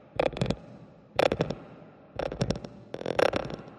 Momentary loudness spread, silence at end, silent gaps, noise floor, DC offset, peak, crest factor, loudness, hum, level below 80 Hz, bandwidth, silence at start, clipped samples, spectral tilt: 20 LU; 0 s; none; -50 dBFS; under 0.1%; -6 dBFS; 26 dB; -31 LUFS; none; -50 dBFS; 12 kHz; 0.15 s; under 0.1%; -6 dB/octave